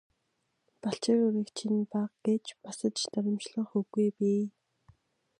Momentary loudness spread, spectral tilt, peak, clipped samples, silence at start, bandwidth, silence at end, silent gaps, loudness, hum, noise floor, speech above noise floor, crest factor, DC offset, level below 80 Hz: 8 LU; -5.5 dB/octave; -14 dBFS; under 0.1%; 0.85 s; 11 kHz; 0.9 s; none; -31 LUFS; none; -79 dBFS; 49 dB; 18 dB; under 0.1%; -78 dBFS